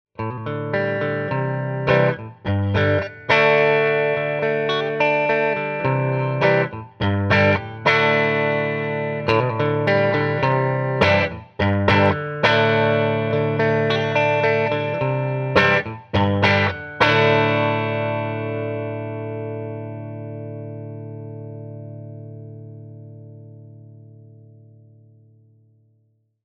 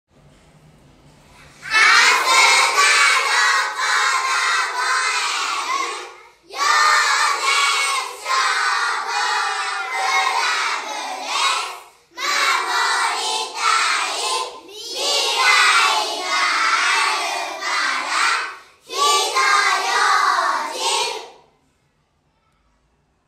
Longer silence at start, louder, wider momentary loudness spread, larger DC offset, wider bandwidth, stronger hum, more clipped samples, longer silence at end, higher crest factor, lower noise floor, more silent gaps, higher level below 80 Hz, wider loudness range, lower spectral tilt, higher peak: second, 0.2 s vs 1.6 s; about the same, -19 LUFS vs -17 LUFS; first, 17 LU vs 11 LU; neither; second, 6.8 kHz vs 16 kHz; neither; neither; first, 2.3 s vs 1.95 s; about the same, 20 dB vs 18 dB; about the same, -64 dBFS vs -64 dBFS; neither; first, -52 dBFS vs -68 dBFS; first, 15 LU vs 6 LU; first, -7 dB/octave vs 2.5 dB/octave; about the same, -2 dBFS vs -2 dBFS